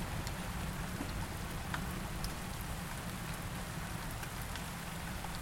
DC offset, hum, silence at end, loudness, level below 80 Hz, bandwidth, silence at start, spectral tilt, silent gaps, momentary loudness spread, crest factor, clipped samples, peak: under 0.1%; none; 0 s; -41 LUFS; -46 dBFS; 17 kHz; 0 s; -4 dB/octave; none; 2 LU; 18 dB; under 0.1%; -22 dBFS